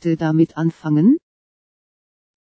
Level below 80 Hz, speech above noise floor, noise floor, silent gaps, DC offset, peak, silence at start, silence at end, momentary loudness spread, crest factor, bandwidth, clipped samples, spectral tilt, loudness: -62 dBFS; over 74 dB; under -90 dBFS; none; under 0.1%; -4 dBFS; 0.05 s; 1.35 s; 6 LU; 16 dB; 7.8 kHz; under 0.1%; -9.5 dB/octave; -18 LUFS